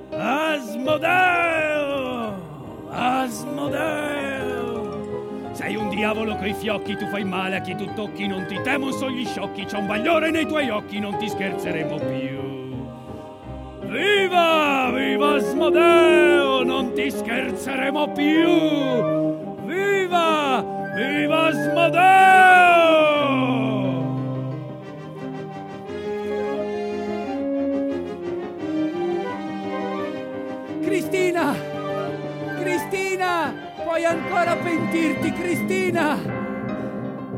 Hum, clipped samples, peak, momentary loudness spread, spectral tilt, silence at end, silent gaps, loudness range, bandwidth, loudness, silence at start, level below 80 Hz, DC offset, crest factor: none; under 0.1%; -2 dBFS; 14 LU; -5 dB/octave; 0 s; none; 11 LU; 16.5 kHz; -21 LUFS; 0 s; -56 dBFS; under 0.1%; 20 dB